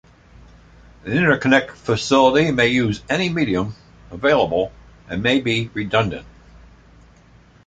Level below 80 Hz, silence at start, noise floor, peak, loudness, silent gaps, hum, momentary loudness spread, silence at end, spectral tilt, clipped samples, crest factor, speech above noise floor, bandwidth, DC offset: -46 dBFS; 1.05 s; -50 dBFS; -2 dBFS; -19 LUFS; none; none; 13 LU; 1.4 s; -5.5 dB/octave; under 0.1%; 18 dB; 31 dB; 9.2 kHz; under 0.1%